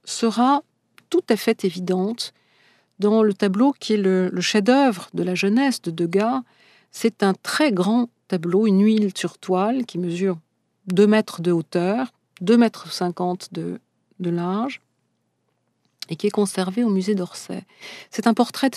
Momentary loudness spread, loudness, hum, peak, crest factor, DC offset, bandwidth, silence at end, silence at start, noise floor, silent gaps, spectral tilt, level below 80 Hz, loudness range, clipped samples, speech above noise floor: 13 LU; -21 LUFS; none; -2 dBFS; 18 dB; under 0.1%; 14 kHz; 0 s; 0.05 s; -71 dBFS; none; -5.5 dB/octave; -78 dBFS; 6 LU; under 0.1%; 51 dB